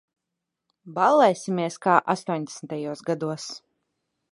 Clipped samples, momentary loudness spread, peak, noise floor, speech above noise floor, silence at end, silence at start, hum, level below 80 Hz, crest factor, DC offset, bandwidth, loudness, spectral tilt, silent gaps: under 0.1%; 16 LU; -2 dBFS; -84 dBFS; 60 dB; 0.75 s; 0.85 s; none; -78 dBFS; 24 dB; under 0.1%; 11.5 kHz; -24 LUFS; -5 dB/octave; none